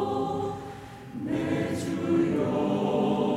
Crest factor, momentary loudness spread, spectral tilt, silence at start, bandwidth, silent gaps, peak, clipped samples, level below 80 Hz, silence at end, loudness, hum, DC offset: 14 dB; 13 LU; -7 dB/octave; 0 s; 14.5 kHz; none; -12 dBFS; under 0.1%; -58 dBFS; 0 s; -28 LUFS; none; under 0.1%